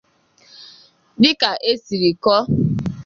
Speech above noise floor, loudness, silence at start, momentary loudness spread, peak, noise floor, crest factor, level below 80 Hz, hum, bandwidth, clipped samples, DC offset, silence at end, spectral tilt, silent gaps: 37 dB; -17 LUFS; 0.6 s; 6 LU; -2 dBFS; -53 dBFS; 18 dB; -48 dBFS; none; 7.4 kHz; under 0.1%; under 0.1%; 0 s; -6 dB/octave; none